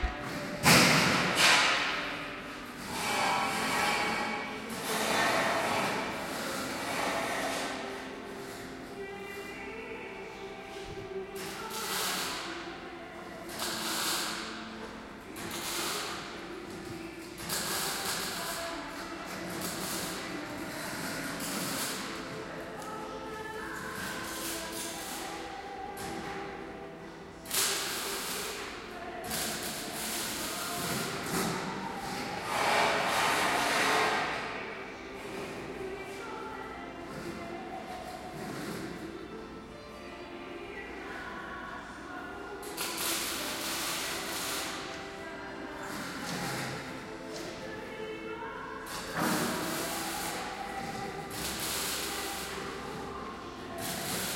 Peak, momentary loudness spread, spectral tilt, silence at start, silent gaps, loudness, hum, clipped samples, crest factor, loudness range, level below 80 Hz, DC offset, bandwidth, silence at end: -10 dBFS; 14 LU; -2.5 dB/octave; 0 s; none; -33 LUFS; none; under 0.1%; 26 dB; 11 LU; -56 dBFS; under 0.1%; 16.5 kHz; 0 s